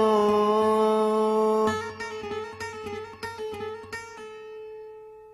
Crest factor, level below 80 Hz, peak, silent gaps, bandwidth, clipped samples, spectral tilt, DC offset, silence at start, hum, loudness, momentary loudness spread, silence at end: 16 dB; -62 dBFS; -10 dBFS; none; 13.5 kHz; under 0.1%; -5.5 dB/octave; under 0.1%; 0 s; none; -26 LUFS; 19 LU; 0 s